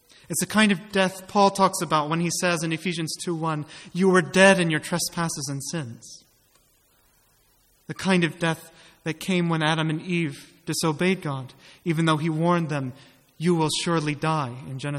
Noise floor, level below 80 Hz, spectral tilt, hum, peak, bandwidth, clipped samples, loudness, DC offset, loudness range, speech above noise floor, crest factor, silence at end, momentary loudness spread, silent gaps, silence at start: -62 dBFS; -62 dBFS; -4.5 dB/octave; none; -4 dBFS; 15 kHz; under 0.1%; -24 LUFS; under 0.1%; 7 LU; 38 dB; 22 dB; 0 s; 13 LU; none; 0.3 s